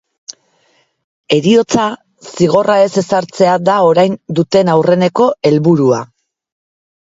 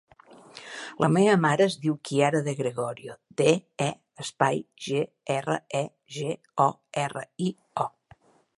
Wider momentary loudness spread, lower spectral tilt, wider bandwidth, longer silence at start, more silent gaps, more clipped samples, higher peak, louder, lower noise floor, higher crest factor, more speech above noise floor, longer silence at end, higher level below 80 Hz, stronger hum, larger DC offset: about the same, 17 LU vs 16 LU; about the same, -6 dB/octave vs -5.5 dB/octave; second, 7.8 kHz vs 11.5 kHz; about the same, 0.3 s vs 0.3 s; first, 1.04-1.24 s vs none; neither; first, 0 dBFS vs -4 dBFS; first, -12 LUFS vs -27 LUFS; about the same, -57 dBFS vs -58 dBFS; second, 12 dB vs 22 dB; first, 46 dB vs 32 dB; first, 1.05 s vs 0.7 s; first, -54 dBFS vs -72 dBFS; neither; neither